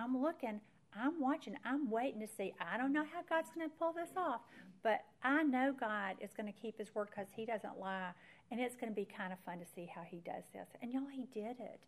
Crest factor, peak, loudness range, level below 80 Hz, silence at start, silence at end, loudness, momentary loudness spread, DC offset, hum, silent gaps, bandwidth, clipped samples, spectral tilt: 20 dB; -22 dBFS; 7 LU; -88 dBFS; 0 s; 0.1 s; -41 LUFS; 12 LU; under 0.1%; none; none; 13.5 kHz; under 0.1%; -5.5 dB/octave